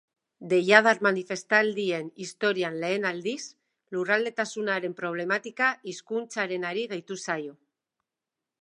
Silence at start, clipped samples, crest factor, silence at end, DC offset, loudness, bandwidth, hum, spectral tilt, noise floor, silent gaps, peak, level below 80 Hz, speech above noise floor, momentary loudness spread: 0.4 s; under 0.1%; 26 dB; 1.1 s; under 0.1%; -26 LUFS; 11 kHz; none; -4 dB/octave; -88 dBFS; none; -2 dBFS; -82 dBFS; 61 dB; 13 LU